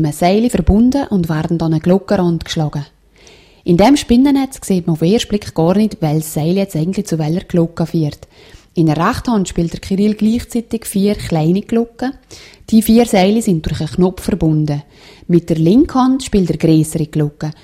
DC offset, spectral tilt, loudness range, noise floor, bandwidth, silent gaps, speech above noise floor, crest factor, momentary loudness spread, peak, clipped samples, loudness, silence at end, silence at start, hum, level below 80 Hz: under 0.1%; -6.5 dB/octave; 3 LU; -44 dBFS; 16 kHz; none; 30 dB; 14 dB; 9 LU; 0 dBFS; under 0.1%; -15 LUFS; 0.1 s; 0 s; none; -32 dBFS